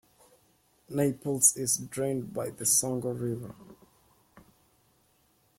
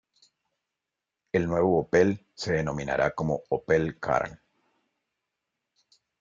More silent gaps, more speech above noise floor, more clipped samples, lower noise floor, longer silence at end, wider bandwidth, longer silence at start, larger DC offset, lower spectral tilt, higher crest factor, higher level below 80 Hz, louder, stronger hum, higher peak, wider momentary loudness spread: neither; second, 39 dB vs 61 dB; neither; second, -68 dBFS vs -87 dBFS; second, 1.2 s vs 1.85 s; first, 16.5 kHz vs 7.6 kHz; second, 0.9 s vs 1.35 s; neither; second, -4 dB/octave vs -6.5 dB/octave; about the same, 24 dB vs 20 dB; second, -68 dBFS vs -56 dBFS; about the same, -28 LUFS vs -27 LUFS; neither; about the same, -8 dBFS vs -10 dBFS; first, 14 LU vs 7 LU